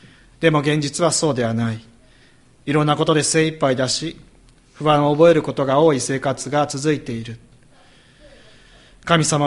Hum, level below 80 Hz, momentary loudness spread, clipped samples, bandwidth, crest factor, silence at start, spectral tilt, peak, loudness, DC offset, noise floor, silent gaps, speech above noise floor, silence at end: none; -52 dBFS; 13 LU; under 0.1%; 11.5 kHz; 18 dB; 0.4 s; -4.5 dB/octave; -2 dBFS; -18 LUFS; under 0.1%; -51 dBFS; none; 33 dB; 0 s